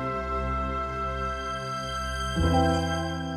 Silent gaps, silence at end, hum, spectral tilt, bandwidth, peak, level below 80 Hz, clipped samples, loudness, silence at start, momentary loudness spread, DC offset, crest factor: none; 0 s; none; -5.5 dB/octave; 13.5 kHz; -12 dBFS; -36 dBFS; under 0.1%; -28 LUFS; 0 s; 8 LU; under 0.1%; 16 dB